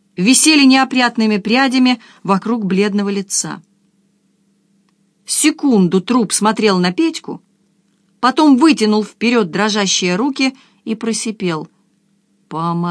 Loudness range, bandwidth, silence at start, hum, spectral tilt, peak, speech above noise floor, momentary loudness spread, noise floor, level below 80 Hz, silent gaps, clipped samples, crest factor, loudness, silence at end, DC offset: 5 LU; 11 kHz; 0.2 s; none; -3.5 dB/octave; 0 dBFS; 45 dB; 12 LU; -59 dBFS; -66 dBFS; none; under 0.1%; 16 dB; -14 LUFS; 0 s; under 0.1%